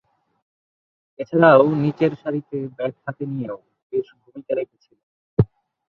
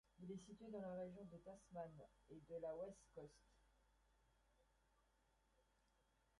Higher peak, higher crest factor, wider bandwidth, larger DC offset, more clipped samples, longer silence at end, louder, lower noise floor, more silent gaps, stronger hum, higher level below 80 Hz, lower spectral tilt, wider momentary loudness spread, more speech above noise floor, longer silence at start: first, -2 dBFS vs -42 dBFS; about the same, 20 dB vs 16 dB; second, 6 kHz vs 11 kHz; neither; neither; second, 0.5 s vs 0.8 s; first, -21 LUFS vs -56 LUFS; first, under -90 dBFS vs -82 dBFS; first, 3.83-3.90 s, 5.03-5.37 s vs none; neither; first, -50 dBFS vs -80 dBFS; first, -10 dB/octave vs -7 dB/octave; first, 21 LU vs 12 LU; first, over 70 dB vs 26 dB; first, 1.2 s vs 0.15 s